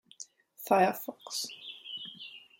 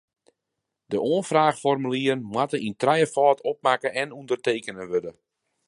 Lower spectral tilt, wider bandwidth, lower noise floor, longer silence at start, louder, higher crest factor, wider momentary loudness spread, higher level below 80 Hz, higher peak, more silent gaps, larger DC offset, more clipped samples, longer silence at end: second, -3 dB/octave vs -5 dB/octave; first, 17 kHz vs 11.5 kHz; second, -53 dBFS vs -83 dBFS; second, 0.2 s vs 0.9 s; second, -32 LUFS vs -24 LUFS; about the same, 22 dB vs 20 dB; first, 21 LU vs 9 LU; second, -82 dBFS vs -70 dBFS; second, -12 dBFS vs -6 dBFS; neither; neither; neither; second, 0.2 s vs 0.55 s